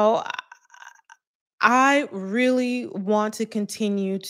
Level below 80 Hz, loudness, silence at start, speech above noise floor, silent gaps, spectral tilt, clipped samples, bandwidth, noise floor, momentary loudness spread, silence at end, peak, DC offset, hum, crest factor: -80 dBFS; -22 LUFS; 0 s; 27 dB; 1.27-1.46 s, 1.53-1.58 s; -4.5 dB/octave; under 0.1%; 16 kHz; -48 dBFS; 10 LU; 0 s; -2 dBFS; under 0.1%; none; 20 dB